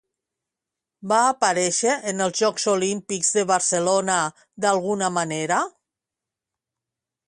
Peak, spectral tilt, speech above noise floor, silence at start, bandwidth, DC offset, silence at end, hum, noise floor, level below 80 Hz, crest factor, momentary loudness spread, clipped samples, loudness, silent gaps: -4 dBFS; -2.5 dB/octave; 65 dB; 1.05 s; 11.5 kHz; under 0.1%; 1.6 s; none; -87 dBFS; -70 dBFS; 20 dB; 5 LU; under 0.1%; -22 LUFS; none